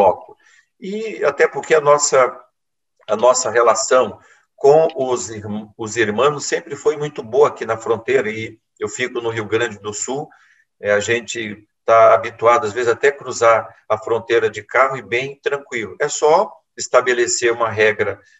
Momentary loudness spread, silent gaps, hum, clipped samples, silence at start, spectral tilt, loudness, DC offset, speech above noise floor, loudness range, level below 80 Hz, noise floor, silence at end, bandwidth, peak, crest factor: 13 LU; none; none; under 0.1%; 0 s; -3 dB/octave; -17 LUFS; under 0.1%; 61 dB; 5 LU; -64 dBFS; -78 dBFS; 0.25 s; 8.6 kHz; -2 dBFS; 16 dB